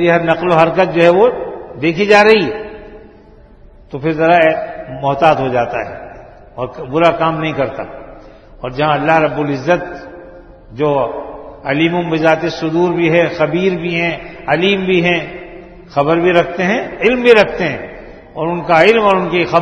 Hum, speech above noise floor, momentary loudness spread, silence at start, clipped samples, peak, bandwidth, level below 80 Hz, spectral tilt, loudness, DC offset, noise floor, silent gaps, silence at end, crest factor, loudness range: none; 28 dB; 19 LU; 0 s; 0.1%; 0 dBFS; 9 kHz; -44 dBFS; -6.5 dB/octave; -13 LUFS; under 0.1%; -41 dBFS; none; 0 s; 14 dB; 5 LU